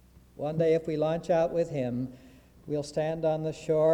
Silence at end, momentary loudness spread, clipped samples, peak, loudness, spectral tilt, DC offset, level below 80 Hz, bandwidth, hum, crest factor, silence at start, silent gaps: 0 s; 9 LU; under 0.1%; -16 dBFS; -29 LUFS; -7.5 dB/octave; under 0.1%; -58 dBFS; 11 kHz; none; 14 dB; 0.4 s; none